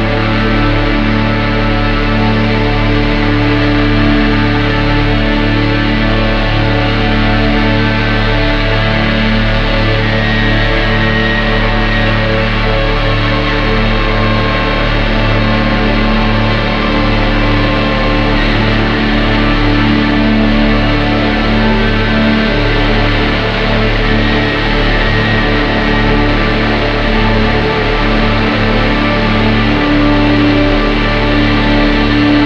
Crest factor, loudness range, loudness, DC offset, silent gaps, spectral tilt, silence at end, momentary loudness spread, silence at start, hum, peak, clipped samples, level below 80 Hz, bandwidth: 10 dB; 1 LU; -11 LUFS; under 0.1%; none; -7 dB/octave; 0 s; 2 LU; 0 s; none; 0 dBFS; under 0.1%; -16 dBFS; 6.8 kHz